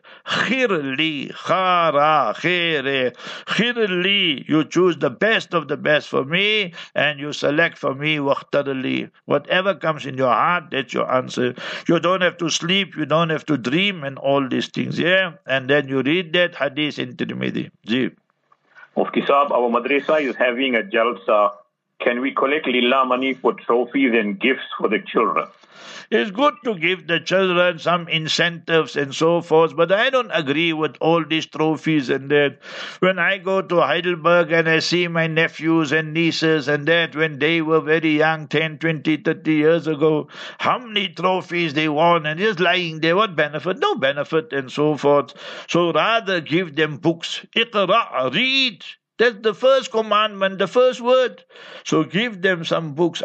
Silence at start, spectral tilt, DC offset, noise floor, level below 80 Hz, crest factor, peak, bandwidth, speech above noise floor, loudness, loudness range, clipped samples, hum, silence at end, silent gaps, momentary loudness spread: 0.05 s; -5 dB/octave; under 0.1%; -62 dBFS; -74 dBFS; 18 dB; -2 dBFS; 8.4 kHz; 42 dB; -19 LUFS; 2 LU; under 0.1%; none; 0 s; none; 6 LU